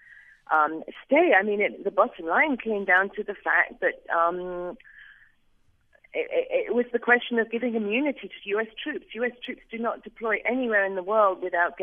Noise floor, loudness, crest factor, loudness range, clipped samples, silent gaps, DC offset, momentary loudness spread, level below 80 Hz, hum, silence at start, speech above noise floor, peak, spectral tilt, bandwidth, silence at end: -63 dBFS; -25 LUFS; 20 dB; 6 LU; under 0.1%; none; under 0.1%; 12 LU; -64 dBFS; none; 0.5 s; 38 dB; -6 dBFS; -7.5 dB/octave; 3.7 kHz; 0 s